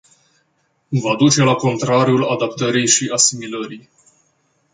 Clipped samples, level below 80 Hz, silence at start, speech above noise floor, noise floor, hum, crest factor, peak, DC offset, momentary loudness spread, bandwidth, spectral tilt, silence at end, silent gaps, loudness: under 0.1%; -60 dBFS; 0.9 s; 48 dB; -65 dBFS; none; 18 dB; 0 dBFS; under 0.1%; 13 LU; 9.6 kHz; -3.5 dB/octave; 0.95 s; none; -16 LUFS